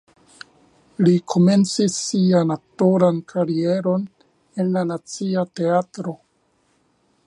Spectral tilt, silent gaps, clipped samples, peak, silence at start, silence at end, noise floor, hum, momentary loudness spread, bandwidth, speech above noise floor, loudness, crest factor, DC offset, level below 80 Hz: -6.5 dB/octave; none; under 0.1%; -2 dBFS; 1 s; 1.1 s; -64 dBFS; none; 14 LU; 11.5 kHz; 45 dB; -20 LUFS; 18 dB; under 0.1%; -66 dBFS